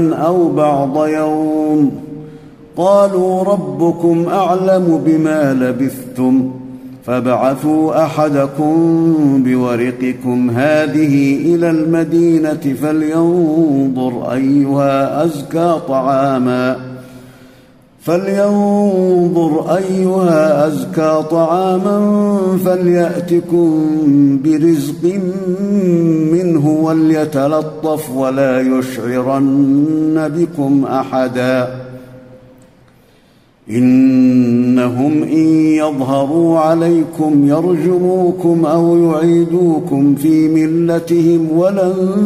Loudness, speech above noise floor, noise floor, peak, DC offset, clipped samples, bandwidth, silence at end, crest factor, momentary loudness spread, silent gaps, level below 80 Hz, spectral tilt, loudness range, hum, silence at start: -13 LUFS; 36 dB; -49 dBFS; 0 dBFS; under 0.1%; under 0.1%; 15 kHz; 0 s; 12 dB; 6 LU; none; -54 dBFS; -8 dB/octave; 3 LU; none; 0 s